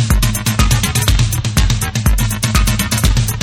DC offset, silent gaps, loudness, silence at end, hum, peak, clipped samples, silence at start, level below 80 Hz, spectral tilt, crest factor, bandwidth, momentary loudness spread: under 0.1%; none; -15 LUFS; 0 s; none; 0 dBFS; under 0.1%; 0 s; -18 dBFS; -4 dB/octave; 14 dB; 19 kHz; 2 LU